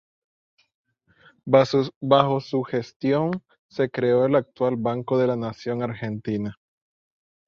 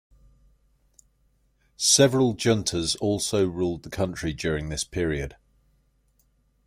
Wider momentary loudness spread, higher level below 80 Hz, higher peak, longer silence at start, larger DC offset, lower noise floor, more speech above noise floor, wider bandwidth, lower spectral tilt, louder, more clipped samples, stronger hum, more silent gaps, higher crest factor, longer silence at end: about the same, 10 LU vs 12 LU; second, -62 dBFS vs -48 dBFS; about the same, -4 dBFS vs -6 dBFS; second, 1.45 s vs 1.8 s; neither; second, -58 dBFS vs -66 dBFS; second, 35 dB vs 42 dB; second, 7.2 kHz vs 16.5 kHz; first, -7.5 dB/octave vs -4 dB/octave; about the same, -23 LUFS vs -24 LUFS; neither; second, none vs 50 Hz at -50 dBFS; first, 1.96-2.01 s, 2.96-3.00 s, 3.59-3.69 s vs none; about the same, 22 dB vs 22 dB; second, 0.95 s vs 1.35 s